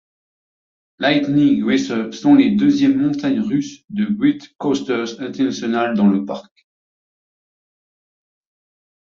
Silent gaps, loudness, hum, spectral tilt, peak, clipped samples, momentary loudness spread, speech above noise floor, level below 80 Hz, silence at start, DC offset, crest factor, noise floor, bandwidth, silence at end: 3.84-3.88 s; -17 LUFS; none; -6 dB/octave; -2 dBFS; under 0.1%; 10 LU; over 73 dB; -58 dBFS; 1 s; under 0.1%; 16 dB; under -90 dBFS; 7.4 kHz; 2.6 s